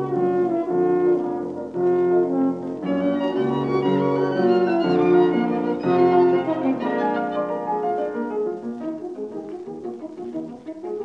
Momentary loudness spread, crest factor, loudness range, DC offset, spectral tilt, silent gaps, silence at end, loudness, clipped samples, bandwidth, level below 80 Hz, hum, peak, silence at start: 14 LU; 14 dB; 8 LU; under 0.1%; -8.5 dB/octave; none; 0 s; -22 LUFS; under 0.1%; 5.8 kHz; -66 dBFS; none; -6 dBFS; 0 s